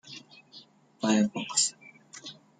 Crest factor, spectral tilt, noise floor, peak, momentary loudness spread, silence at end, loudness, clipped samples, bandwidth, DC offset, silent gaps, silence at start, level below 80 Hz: 22 dB; -3 dB/octave; -55 dBFS; -10 dBFS; 23 LU; 0.25 s; -27 LUFS; under 0.1%; 9.6 kHz; under 0.1%; none; 0.05 s; -74 dBFS